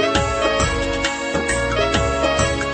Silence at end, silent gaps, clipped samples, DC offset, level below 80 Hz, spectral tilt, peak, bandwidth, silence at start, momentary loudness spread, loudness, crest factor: 0 s; none; under 0.1%; under 0.1%; -30 dBFS; -4 dB/octave; -4 dBFS; 8.8 kHz; 0 s; 3 LU; -19 LUFS; 16 dB